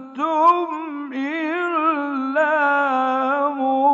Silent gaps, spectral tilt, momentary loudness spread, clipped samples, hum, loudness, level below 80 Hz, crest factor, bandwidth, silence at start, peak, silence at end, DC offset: none; -4 dB/octave; 9 LU; under 0.1%; none; -20 LUFS; -88 dBFS; 16 dB; 7.6 kHz; 0 s; -4 dBFS; 0 s; under 0.1%